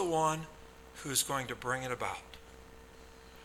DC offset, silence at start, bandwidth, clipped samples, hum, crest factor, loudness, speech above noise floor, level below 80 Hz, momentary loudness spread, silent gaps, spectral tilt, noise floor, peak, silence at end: under 0.1%; 0 s; 19 kHz; under 0.1%; none; 20 dB; -35 LUFS; 19 dB; -60 dBFS; 23 LU; none; -3 dB/octave; -54 dBFS; -16 dBFS; 0 s